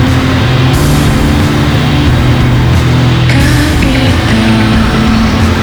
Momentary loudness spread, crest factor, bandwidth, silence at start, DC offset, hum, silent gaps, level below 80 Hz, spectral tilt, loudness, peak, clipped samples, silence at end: 1 LU; 8 dB; over 20 kHz; 0 s; under 0.1%; none; none; -16 dBFS; -6 dB/octave; -8 LUFS; 0 dBFS; under 0.1%; 0 s